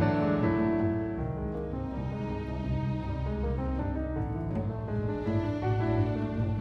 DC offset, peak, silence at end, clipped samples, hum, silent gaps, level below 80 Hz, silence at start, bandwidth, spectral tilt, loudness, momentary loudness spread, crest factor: under 0.1%; -14 dBFS; 0 s; under 0.1%; none; none; -40 dBFS; 0 s; 6 kHz; -10 dB/octave; -31 LUFS; 7 LU; 16 dB